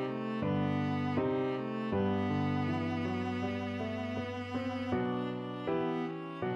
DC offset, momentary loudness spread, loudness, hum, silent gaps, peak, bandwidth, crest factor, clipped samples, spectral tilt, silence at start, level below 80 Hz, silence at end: under 0.1%; 5 LU; -34 LUFS; none; none; -20 dBFS; 7.8 kHz; 14 dB; under 0.1%; -8 dB/octave; 0 s; -66 dBFS; 0 s